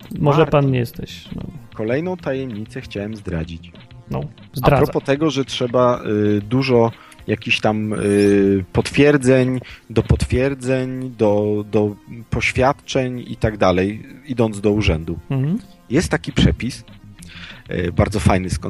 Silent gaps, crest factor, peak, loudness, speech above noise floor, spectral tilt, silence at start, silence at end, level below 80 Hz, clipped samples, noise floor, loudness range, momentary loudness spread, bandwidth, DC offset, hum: none; 18 dB; 0 dBFS; -19 LUFS; 19 dB; -6.5 dB/octave; 0 s; 0 s; -34 dBFS; under 0.1%; -37 dBFS; 6 LU; 14 LU; 14.5 kHz; under 0.1%; none